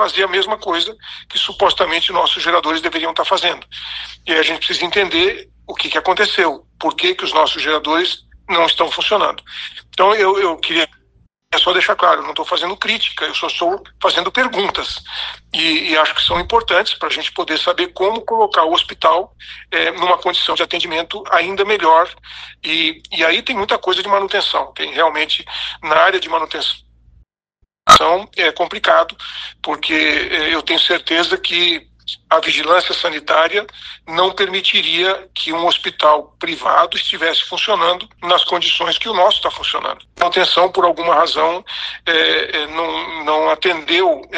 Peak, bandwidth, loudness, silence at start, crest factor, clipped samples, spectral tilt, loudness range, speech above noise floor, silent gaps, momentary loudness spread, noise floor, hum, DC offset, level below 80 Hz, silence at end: 0 dBFS; 14.5 kHz; -15 LUFS; 0 s; 16 dB; under 0.1%; -2 dB/octave; 2 LU; 48 dB; none; 9 LU; -64 dBFS; none; under 0.1%; -48 dBFS; 0 s